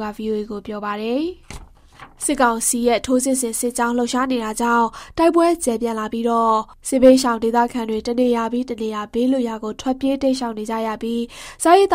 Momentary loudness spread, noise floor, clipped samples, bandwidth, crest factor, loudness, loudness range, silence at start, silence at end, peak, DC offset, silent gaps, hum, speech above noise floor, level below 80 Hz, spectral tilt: 10 LU; -39 dBFS; under 0.1%; 16 kHz; 18 dB; -19 LUFS; 4 LU; 0 s; 0 s; -2 dBFS; under 0.1%; none; none; 20 dB; -46 dBFS; -3.5 dB/octave